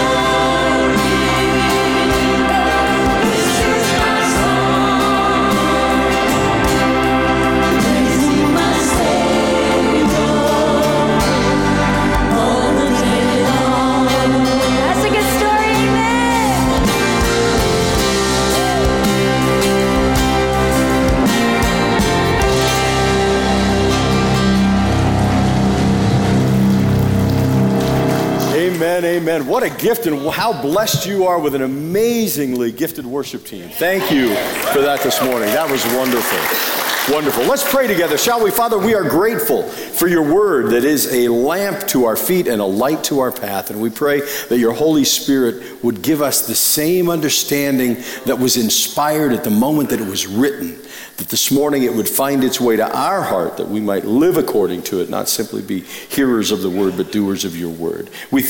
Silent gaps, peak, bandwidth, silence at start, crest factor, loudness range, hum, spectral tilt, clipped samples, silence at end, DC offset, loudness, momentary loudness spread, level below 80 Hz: none; -2 dBFS; 17 kHz; 0 s; 12 dB; 3 LU; none; -4.5 dB/octave; under 0.1%; 0 s; under 0.1%; -15 LUFS; 5 LU; -30 dBFS